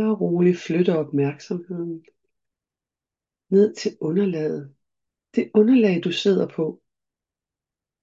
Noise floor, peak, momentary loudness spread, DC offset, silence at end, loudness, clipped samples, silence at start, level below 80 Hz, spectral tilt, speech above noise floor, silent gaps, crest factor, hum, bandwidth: -90 dBFS; -6 dBFS; 13 LU; under 0.1%; 1.3 s; -22 LUFS; under 0.1%; 0 s; -72 dBFS; -7 dB/octave; 69 dB; none; 18 dB; none; 7.8 kHz